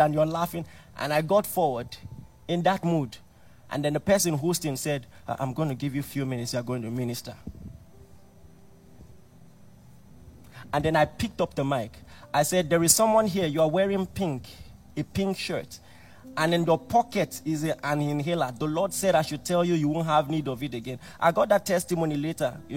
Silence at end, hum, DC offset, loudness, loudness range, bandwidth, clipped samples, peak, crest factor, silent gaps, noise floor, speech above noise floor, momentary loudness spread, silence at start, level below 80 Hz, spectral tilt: 0 s; none; under 0.1%; -26 LUFS; 8 LU; 16.5 kHz; under 0.1%; -4 dBFS; 22 dB; none; -51 dBFS; 25 dB; 14 LU; 0 s; -54 dBFS; -5 dB/octave